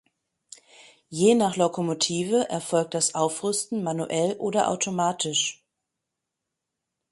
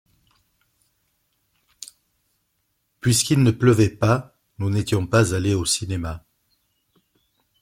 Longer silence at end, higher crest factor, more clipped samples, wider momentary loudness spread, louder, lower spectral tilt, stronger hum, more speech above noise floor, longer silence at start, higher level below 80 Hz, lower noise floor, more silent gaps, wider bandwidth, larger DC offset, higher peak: first, 1.6 s vs 1.45 s; about the same, 20 dB vs 20 dB; neither; second, 6 LU vs 22 LU; second, -24 LUFS vs -20 LUFS; second, -3.5 dB/octave vs -5 dB/octave; neither; first, 60 dB vs 52 dB; second, 1.1 s vs 3.05 s; second, -70 dBFS vs -50 dBFS; first, -84 dBFS vs -72 dBFS; neither; second, 11.5 kHz vs 16 kHz; neither; about the same, -6 dBFS vs -4 dBFS